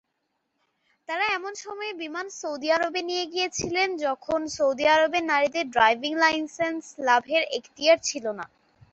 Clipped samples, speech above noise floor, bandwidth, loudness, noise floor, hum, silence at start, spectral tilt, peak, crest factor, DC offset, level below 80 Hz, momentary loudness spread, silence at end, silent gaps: under 0.1%; 52 dB; 8.2 kHz; -25 LUFS; -77 dBFS; none; 1.1 s; -2 dB/octave; -4 dBFS; 20 dB; under 0.1%; -64 dBFS; 12 LU; 0.45 s; none